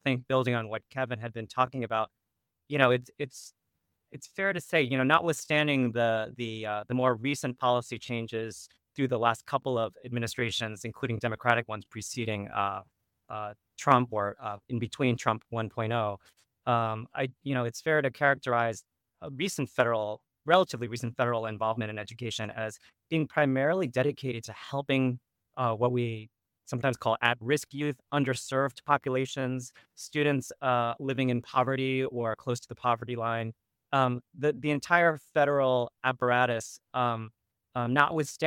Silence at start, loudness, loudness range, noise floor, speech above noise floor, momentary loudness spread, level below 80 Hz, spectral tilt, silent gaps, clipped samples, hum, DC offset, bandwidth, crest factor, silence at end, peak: 0.05 s; -29 LUFS; 4 LU; -80 dBFS; 50 dB; 12 LU; -70 dBFS; -5.5 dB/octave; none; under 0.1%; none; under 0.1%; 17.5 kHz; 24 dB; 0 s; -6 dBFS